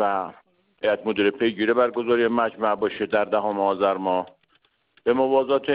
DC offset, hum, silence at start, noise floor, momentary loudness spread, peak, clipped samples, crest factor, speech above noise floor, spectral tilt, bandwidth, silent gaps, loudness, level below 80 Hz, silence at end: under 0.1%; none; 0 s; -66 dBFS; 7 LU; -8 dBFS; under 0.1%; 16 dB; 44 dB; -9.5 dB/octave; 5.2 kHz; none; -23 LUFS; -64 dBFS; 0 s